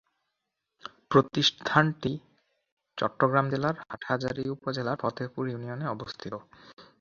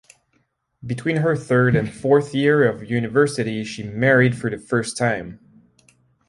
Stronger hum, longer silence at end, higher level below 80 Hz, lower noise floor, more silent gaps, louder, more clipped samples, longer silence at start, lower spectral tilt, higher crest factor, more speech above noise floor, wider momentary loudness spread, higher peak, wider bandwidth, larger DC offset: neither; second, 0.15 s vs 0.95 s; second, -64 dBFS vs -54 dBFS; first, -84 dBFS vs -67 dBFS; first, 2.72-2.77 s, 6.73-6.77 s vs none; second, -28 LUFS vs -20 LUFS; neither; about the same, 0.85 s vs 0.85 s; about the same, -5.5 dB/octave vs -6.5 dB/octave; first, 26 dB vs 18 dB; first, 55 dB vs 48 dB; first, 16 LU vs 11 LU; about the same, -4 dBFS vs -4 dBFS; second, 7.4 kHz vs 11.5 kHz; neither